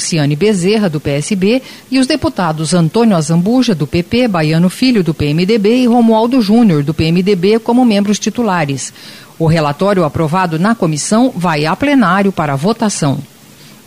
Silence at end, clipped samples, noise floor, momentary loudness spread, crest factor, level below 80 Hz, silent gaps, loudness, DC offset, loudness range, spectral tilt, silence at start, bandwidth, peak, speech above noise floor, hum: 0.6 s; under 0.1%; -38 dBFS; 6 LU; 10 dB; -42 dBFS; none; -12 LUFS; 0.4%; 3 LU; -5.5 dB/octave; 0 s; 16 kHz; -2 dBFS; 27 dB; none